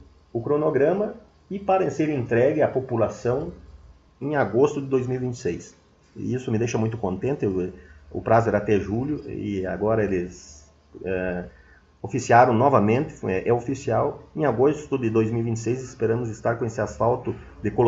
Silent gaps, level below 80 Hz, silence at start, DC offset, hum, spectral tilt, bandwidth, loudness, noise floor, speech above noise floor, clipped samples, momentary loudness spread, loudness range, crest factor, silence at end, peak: none; -50 dBFS; 0 s; under 0.1%; none; -7.5 dB/octave; 8 kHz; -24 LUFS; -49 dBFS; 26 dB; under 0.1%; 12 LU; 5 LU; 22 dB; 0 s; -2 dBFS